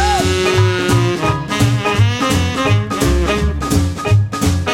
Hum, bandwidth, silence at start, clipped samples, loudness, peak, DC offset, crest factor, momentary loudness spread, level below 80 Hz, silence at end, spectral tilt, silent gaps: none; 16.5 kHz; 0 s; under 0.1%; -15 LUFS; 0 dBFS; under 0.1%; 14 dB; 3 LU; -24 dBFS; 0 s; -5.5 dB/octave; none